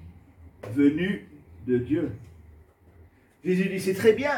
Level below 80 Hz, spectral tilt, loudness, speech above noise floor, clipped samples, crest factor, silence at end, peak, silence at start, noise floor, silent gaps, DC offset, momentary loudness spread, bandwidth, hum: -56 dBFS; -6.5 dB/octave; -26 LUFS; 31 dB; under 0.1%; 20 dB; 0 s; -8 dBFS; 0 s; -55 dBFS; none; under 0.1%; 15 LU; 17.5 kHz; none